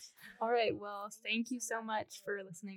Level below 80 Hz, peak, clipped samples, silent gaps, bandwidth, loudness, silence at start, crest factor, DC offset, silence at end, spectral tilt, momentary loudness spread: -84 dBFS; -22 dBFS; under 0.1%; none; 18 kHz; -38 LUFS; 0 s; 16 dB; under 0.1%; 0 s; -3 dB/octave; 10 LU